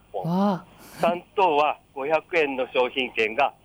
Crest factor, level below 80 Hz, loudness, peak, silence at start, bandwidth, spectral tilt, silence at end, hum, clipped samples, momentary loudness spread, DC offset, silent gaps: 16 dB; -62 dBFS; -24 LUFS; -10 dBFS; 0.15 s; over 20 kHz; -6 dB/octave; 0.15 s; none; under 0.1%; 5 LU; under 0.1%; none